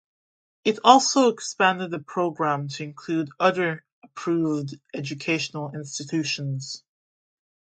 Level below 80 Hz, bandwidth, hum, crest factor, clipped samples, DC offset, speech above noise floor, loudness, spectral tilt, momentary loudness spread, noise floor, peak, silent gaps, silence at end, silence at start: -74 dBFS; 9.2 kHz; none; 24 dB; under 0.1%; under 0.1%; over 66 dB; -24 LUFS; -4 dB/octave; 16 LU; under -90 dBFS; 0 dBFS; 3.92-4.02 s; 0.9 s; 0.65 s